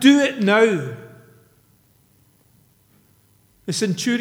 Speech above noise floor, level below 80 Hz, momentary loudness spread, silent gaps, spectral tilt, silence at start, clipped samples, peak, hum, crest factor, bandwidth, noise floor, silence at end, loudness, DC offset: 41 dB; -68 dBFS; 19 LU; none; -4.5 dB/octave; 0 s; under 0.1%; 0 dBFS; none; 20 dB; 15.5 kHz; -58 dBFS; 0 s; -18 LUFS; under 0.1%